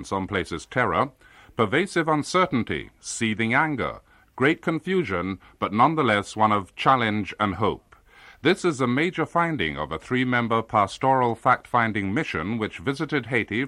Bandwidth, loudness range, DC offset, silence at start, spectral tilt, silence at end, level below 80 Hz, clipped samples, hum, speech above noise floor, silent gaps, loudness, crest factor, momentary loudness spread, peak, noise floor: 12.5 kHz; 2 LU; under 0.1%; 0 s; -5.5 dB/octave; 0 s; -54 dBFS; under 0.1%; none; 27 dB; none; -24 LUFS; 18 dB; 7 LU; -6 dBFS; -51 dBFS